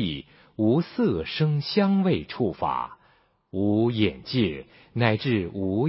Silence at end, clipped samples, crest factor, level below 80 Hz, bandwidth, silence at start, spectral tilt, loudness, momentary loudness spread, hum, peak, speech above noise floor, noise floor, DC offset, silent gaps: 0 s; under 0.1%; 20 dB; -50 dBFS; 5.8 kHz; 0 s; -11 dB/octave; -25 LUFS; 13 LU; none; -4 dBFS; 38 dB; -62 dBFS; under 0.1%; none